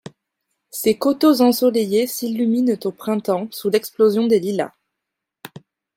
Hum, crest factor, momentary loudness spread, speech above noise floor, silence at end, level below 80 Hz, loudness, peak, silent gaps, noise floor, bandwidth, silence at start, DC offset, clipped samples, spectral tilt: none; 16 dB; 9 LU; 64 dB; 0.5 s; -68 dBFS; -19 LUFS; -4 dBFS; none; -82 dBFS; 16.5 kHz; 0.75 s; under 0.1%; under 0.1%; -5 dB/octave